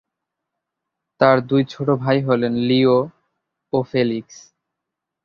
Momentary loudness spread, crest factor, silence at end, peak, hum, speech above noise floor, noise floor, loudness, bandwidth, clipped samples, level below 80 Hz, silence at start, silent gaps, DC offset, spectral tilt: 8 LU; 18 dB; 1.05 s; -2 dBFS; none; 65 dB; -82 dBFS; -19 LUFS; 7 kHz; under 0.1%; -58 dBFS; 1.2 s; none; under 0.1%; -7.5 dB/octave